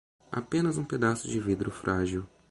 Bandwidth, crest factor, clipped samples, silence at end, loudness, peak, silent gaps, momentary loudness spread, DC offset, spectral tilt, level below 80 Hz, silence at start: 11.5 kHz; 18 dB; under 0.1%; 0.25 s; -30 LUFS; -12 dBFS; none; 9 LU; under 0.1%; -6 dB/octave; -52 dBFS; 0.3 s